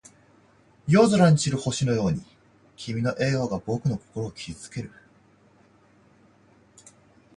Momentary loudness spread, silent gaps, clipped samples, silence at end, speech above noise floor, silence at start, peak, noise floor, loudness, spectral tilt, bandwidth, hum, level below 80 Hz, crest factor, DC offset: 19 LU; none; under 0.1%; 2.5 s; 35 dB; 0.85 s; -6 dBFS; -58 dBFS; -24 LUFS; -6 dB/octave; 11 kHz; none; -54 dBFS; 20 dB; under 0.1%